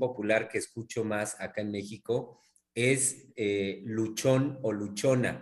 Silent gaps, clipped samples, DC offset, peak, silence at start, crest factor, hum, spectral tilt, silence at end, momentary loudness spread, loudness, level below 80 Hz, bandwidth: none; under 0.1%; under 0.1%; -12 dBFS; 0 s; 18 dB; none; -4.5 dB/octave; 0 s; 9 LU; -30 LUFS; -70 dBFS; 13 kHz